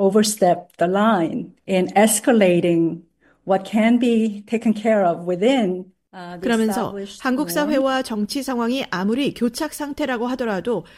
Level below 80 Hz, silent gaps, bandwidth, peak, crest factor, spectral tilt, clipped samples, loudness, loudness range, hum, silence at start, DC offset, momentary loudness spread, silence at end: -58 dBFS; none; 16 kHz; -2 dBFS; 16 dB; -5 dB/octave; under 0.1%; -20 LUFS; 4 LU; none; 0 s; under 0.1%; 10 LU; 0.15 s